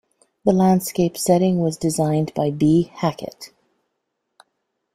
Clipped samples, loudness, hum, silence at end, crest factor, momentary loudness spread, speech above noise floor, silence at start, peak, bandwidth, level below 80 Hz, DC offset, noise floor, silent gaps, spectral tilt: under 0.1%; -19 LUFS; none; 1.45 s; 18 dB; 14 LU; 57 dB; 0.45 s; -2 dBFS; 16 kHz; -54 dBFS; under 0.1%; -76 dBFS; none; -6.5 dB/octave